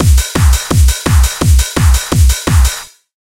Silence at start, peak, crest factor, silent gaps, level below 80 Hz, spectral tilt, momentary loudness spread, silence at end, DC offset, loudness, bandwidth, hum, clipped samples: 0 s; 0 dBFS; 10 dB; none; -12 dBFS; -4.5 dB/octave; 1 LU; 0.45 s; under 0.1%; -11 LUFS; 16.5 kHz; none; under 0.1%